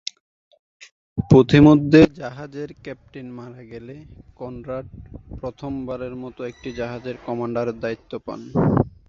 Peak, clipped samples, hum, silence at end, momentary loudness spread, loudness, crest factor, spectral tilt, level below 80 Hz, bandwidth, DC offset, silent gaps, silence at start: 0 dBFS; under 0.1%; none; 0.2 s; 25 LU; -19 LUFS; 20 dB; -8 dB/octave; -44 dBFS; 7.4 kHz; under 0.1%; none; 1.15 s